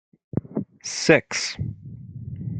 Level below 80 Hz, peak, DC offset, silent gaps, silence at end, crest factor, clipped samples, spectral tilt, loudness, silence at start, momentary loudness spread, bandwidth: -54 dBFS; 0 dBFS; under 0.1%; none; 0 s; 26 dB; under 0.1%; -4 dB/octave; -24 LUFS; 0.35 s; 20 LU; 9.4 kHz